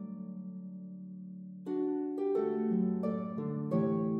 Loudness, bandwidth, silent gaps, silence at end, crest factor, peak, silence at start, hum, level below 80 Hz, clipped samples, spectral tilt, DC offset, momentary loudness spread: -34 LUFS; 4.2 kHz; none; 0 s; 14 dB; -20 dBFS; 0 s; none; -84 dBFS; under 0.1%; -11.5 dB/octave; under 0.1%; 15 LU